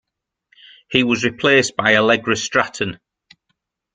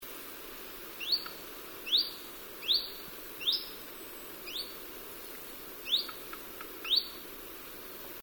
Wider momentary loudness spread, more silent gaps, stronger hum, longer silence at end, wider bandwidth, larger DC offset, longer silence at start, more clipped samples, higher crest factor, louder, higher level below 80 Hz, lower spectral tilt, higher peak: second, 8 LU vs 14 LU; neither; neither; first, 1 s vs 0 s; second, 9.4 kHz vs over 20 kHz; neither; first, 0.9 s vs 0 s; neither; about the same, 20 dB vs 22 dB; first, -17 LUFS vs -34 LUFS; first, -56 dBFS vs -64 dBFS; first, -3.5 dB/octave vs -0.5 dB/octave; first, 0 dBFS vs -16 dBFS